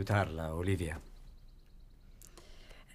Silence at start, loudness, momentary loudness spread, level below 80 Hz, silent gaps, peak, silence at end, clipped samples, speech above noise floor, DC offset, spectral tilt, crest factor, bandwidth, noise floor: 0 s; -36 LUFS; 25 LU; -52 dBFS; none; -16 dBFS; 0 s; under 0.1%; 22 dB; under 0.1%; -6.5 dB/octave; 22 dB; 15.5 kHz; -56 dBFS